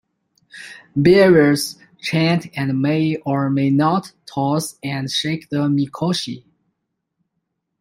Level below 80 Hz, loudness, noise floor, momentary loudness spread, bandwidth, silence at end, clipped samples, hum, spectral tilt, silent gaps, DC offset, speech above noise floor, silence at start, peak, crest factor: -56 dBFS; -18 LUFS; -76 dBFS; 16 LU; 16 kHz; 1.45 s; under 0.1%; none; -6 dB/octave; none; under 0.1%; 58 dB; 0.55 s; 0 dBFS; 18 dB